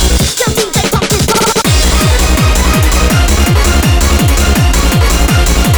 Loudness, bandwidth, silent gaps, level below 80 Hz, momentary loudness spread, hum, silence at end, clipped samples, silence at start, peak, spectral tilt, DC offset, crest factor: -10 LUFS; over 20 kHz; none; -12 dBFS; 2 LU; none; 0 s; under 0.1%; 0 s; 0 dBFS; -4 dB/octave; under 0.1%; 8 dB